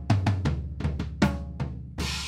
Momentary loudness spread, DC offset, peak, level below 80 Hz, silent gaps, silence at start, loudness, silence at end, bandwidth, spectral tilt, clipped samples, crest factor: 9 LU; under 0.1%; -10 dBFS; -36 dBFS; none; 0 s; -29 LUFS; 0 s; 15 kHz; -6 dB/octave; under 0.1%; 18 dB